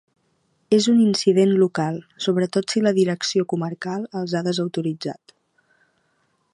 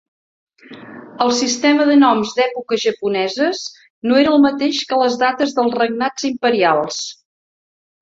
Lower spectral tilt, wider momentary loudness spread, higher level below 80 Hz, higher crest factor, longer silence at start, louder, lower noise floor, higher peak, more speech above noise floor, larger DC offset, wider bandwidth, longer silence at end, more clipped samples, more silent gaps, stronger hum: first, -5.5 dB/octave vs -3 dB/octave; about the same, 11 LU vs 13 LU; second, -70 dBFS vs -62 dBFS; about the same, 16 dB vs 16 dB; about the same, 0.7 s vs 0.7 s; second, -21 LUFS vs -16 LUFS; second, -67 dBFS vs under -90 dBFS; about the same, -4 dBFS vs -2 dBFS; second, 47 dB vs over 74 dB; neither; first, 11.5 kHz vs 7.8 kHz; first, 1.4 s vs 0.9 s; neither; second, none vs 3.90-4.02 s; neither